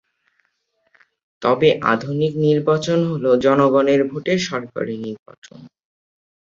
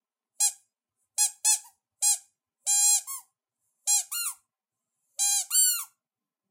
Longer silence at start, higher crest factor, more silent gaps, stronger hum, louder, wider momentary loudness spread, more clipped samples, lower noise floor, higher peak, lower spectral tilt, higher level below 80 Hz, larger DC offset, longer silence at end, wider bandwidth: first, 1.4 s vs 0.4 s; about the same, 18 dB vs 20 dB; first, 5.19-5.26 s, 5.38-5.42 s vs none; neither; first, -18 LUFS vs -24 LUFS; about the same, 12 LU vs 13 LU; neither; second, -68 dBFS vs -90 dBFS; first, -2 dBFS vs -10 dBFS; first, -6.5 dB/octave vs 8.5 dB/octave; first, -60 dBFS vs under -90 dBFS; neither; first, 0.8 s vs 0.65 s; second, 7.6 kHz vs 16 kHz